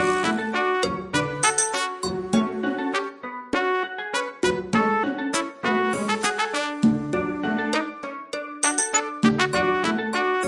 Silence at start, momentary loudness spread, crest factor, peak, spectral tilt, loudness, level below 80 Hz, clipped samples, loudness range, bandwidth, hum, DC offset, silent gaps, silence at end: 0 s; 7 LU; 20 dB; -4 dBFS; -3 dB/octave; -24 LUFS; -56 dBFS; under 0.1%; 2 LU; 11.5 kHz; none; under 0.1%; none; 0 s